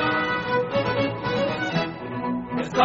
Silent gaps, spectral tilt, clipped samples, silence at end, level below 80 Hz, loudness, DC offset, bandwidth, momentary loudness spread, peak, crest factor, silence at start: none; -3.5 dB/octave; under 0.1%; 0 s; -52 dBFS; -25 LUFS; under 0.1%; 7.6 kHz; 5 LU; -6 dBFS; 18 dB; 0 s